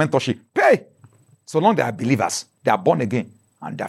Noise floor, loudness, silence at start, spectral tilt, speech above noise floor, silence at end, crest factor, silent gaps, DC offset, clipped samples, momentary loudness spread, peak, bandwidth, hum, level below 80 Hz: -52 dBFS; -20 LUFS; 0 s; -5.5 dB/octave; 33 dB; 0 s; 18 dB; none; under 0.1%; under 0.1%; 10 LU; -4 dBFS; 14 kHz; none; -70 dBFS